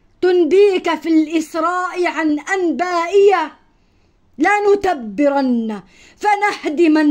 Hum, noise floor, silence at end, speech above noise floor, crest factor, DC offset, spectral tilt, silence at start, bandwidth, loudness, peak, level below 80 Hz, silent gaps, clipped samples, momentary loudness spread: none; -55 dBFS; 0 s; 40 dB; 14 dB; under 0.1%; -4.5 dB/octave; 0.2 s; 15 kHz; -16 LUFS; -2 dBFS; -54 dBFS; none; under 0.1%; 7 LU